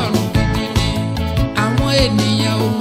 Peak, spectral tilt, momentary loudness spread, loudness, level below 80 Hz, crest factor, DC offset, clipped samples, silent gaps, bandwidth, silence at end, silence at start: -2 dBFS; -5.5 dB/octave; 5 LU; -16 LUFS; -26 dBFS; 14 dB; under 0.1%; under 0.1%; none; 16 kHz; 0 s; 0 s